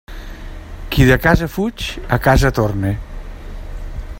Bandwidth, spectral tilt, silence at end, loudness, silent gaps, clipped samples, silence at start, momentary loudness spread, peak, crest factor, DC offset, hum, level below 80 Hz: 16.5 kHz; -6 dB/octave; 0 s; -16 LUFS; none; under 0.1%; 0.1 s; 22 LU; 0 dBFS; 18 dB; under 0.1%; none; -26 dBFS